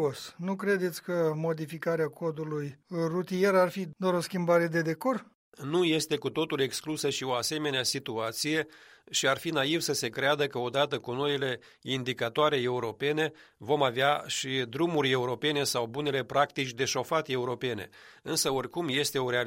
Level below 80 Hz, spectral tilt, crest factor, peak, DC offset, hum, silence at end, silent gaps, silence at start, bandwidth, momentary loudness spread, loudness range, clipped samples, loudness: -72 dBFS; -4 dB/octave; 20 dB; -10 dBFS; under 0.1%; none; 0 s; 5.35-5.52 s; 0 s; 16 kHz; 7 LU; 2 LU; under 0.1%; -29 LUFS